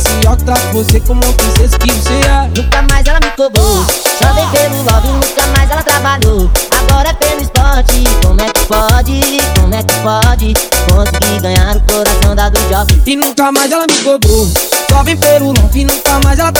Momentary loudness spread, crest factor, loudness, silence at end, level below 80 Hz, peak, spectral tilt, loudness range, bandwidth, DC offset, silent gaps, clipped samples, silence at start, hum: 2 LU; 8 dB; -9 LUFS; 0 s; -12 dBFS; 0 dBFS; -4 dB/octave; 1 LU; over 20 kHz; under 0.1%; none; 0.8%; 0 s; none